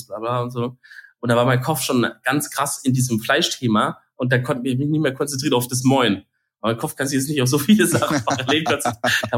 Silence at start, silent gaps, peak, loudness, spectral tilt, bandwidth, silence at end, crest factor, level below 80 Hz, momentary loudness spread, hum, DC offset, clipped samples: 0 s; none; -4 dBFS; -20 LUFS; -4.5 dB/octave; 17 kHz; 0 s; 16 dB; -60 dBFS; 8 LU; none; under 0.1%; under 0.1%